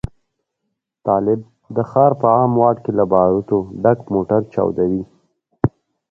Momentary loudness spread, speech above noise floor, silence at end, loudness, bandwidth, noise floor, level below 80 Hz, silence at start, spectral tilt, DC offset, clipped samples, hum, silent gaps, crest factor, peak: 10 LU; 60 dB; 0.45 s; -17 LUFS; 6 kHz; -76 dBFS; -46 dBFS; 1.05 s; -11.5 dB/octave; under 0.1%; under 0.1%; none; none; 18 dB; 0 dBFS